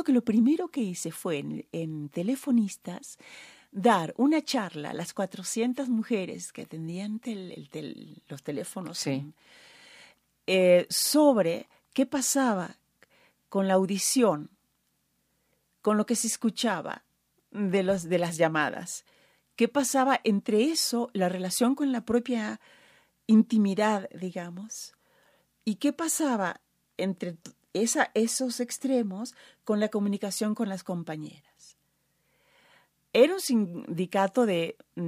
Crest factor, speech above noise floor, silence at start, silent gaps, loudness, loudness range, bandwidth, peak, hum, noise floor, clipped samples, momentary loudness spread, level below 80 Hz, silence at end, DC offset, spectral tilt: 20 dB; 47 dB; 0 s; none; -27 LUFS; 7 LU; 15.5 kHz; -8 dBFS; none; -74 dBFS; under 0.1%; 17 LU; -74 dBFS; 0 s; under 0.1%; -4.5 dB/octave